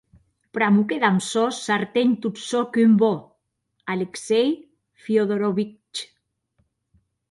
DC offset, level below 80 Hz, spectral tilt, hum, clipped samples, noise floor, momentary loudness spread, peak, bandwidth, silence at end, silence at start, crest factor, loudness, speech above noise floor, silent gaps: under 0.1%; -68 dBFS; -5.5 dB/octave; none; under 0.1%; -73 dBFS; 15 LU; -6 dBFS; 11.5 kHz; 1.25 s; 0.55 s; 18 dB; -22 LUFS; 53 dB; none